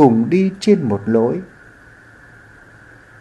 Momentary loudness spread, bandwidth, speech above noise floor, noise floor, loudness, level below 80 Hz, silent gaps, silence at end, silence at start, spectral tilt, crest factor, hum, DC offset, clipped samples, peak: 10 LU; 9.6 kHz; 30 dB; -44 dBFS; -16 LUFS; -54 dBFS; none; 1.75 s; 0 s; -7.5 dB/octave; 18 dB; none; under 0.1%; under 0.1%; 0 dBFS